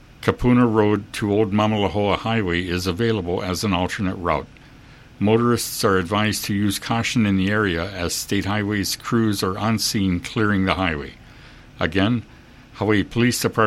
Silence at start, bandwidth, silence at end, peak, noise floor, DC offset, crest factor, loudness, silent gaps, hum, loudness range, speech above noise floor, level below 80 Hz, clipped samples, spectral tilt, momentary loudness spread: 0.2 s; 16 kHz; 0 s; 0 dBFS; -45 dBFS; under 0.1%; 20 dB; -21 LUFS; none; none; 3 LU; 25 dB; -44 dBFS; under 0.1%; -5 dB/octave; 6 LU